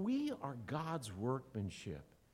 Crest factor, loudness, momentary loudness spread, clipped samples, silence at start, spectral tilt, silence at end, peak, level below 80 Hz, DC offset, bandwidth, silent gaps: 18 dB; -43 LUFS; 10 LU; under 0.1%; 0 s; -6.5 dB/octave; 0.3 s; -24 dBFS; -68 dBFS; under 0.1%; 15.5 kHz; none